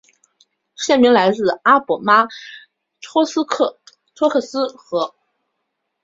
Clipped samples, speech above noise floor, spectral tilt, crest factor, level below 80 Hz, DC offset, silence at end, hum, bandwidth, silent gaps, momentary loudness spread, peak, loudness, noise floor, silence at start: under 0.1%; 58 dB; -4 dB/octave; 18 dB; -64 dBFS; under 0.1%; 0.95 s; none; 7.8 kHz; none; 11 LU; -2 dBFS; -17 LUFS; -75 dBFS; 0.8 s